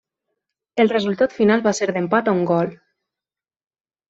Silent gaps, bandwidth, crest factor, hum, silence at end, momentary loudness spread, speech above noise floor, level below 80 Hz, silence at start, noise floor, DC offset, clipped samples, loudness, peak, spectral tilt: none; 8 kHz; 18 dB; none; 1.35 s; 5 LU; over 72 dB; -64 dBFS; 0.75 s; under -90 dBFS; under 0.1%; under 0.1%; -19 LUFS; -4 dBFS; -5.5 dB/octave